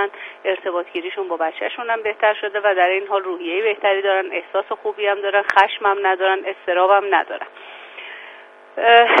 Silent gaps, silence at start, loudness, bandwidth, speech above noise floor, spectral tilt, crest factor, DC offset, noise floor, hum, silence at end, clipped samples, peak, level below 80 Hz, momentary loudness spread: none; 0 s; -19 LUFS; 6.8 kHz; 24 dB; -3 dB/octave; 20 dB; under 0.1%; -42 dBFS; none; 0 s; under 0.1%; 0 dBFS; -74 dBFS; 19 LU